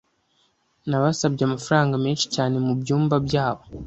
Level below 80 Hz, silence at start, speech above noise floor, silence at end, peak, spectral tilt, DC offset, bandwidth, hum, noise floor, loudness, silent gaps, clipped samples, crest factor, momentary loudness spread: -52 dBFS; 0.85 s; 44 dB; 0 s; -4 dBFS; -5.5 dB/octave; under 0.1%; 8.2 kHz; none; -66 dBFS; -22 LUFS; none; under 0.1%; 20 dB; 4 LU